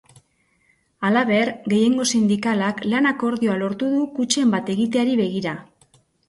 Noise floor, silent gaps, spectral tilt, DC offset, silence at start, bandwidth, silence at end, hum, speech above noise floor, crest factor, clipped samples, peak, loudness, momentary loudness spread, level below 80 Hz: -64 dBFS; none; -4.5 dB/octave; under 0.1%; 1 s; 11.5 kHz; 0.65 s; none; 44 dB; 16 dB; under 0.1%; -4 dBFS; -20 LUFS; 5 LU; -62 dBFS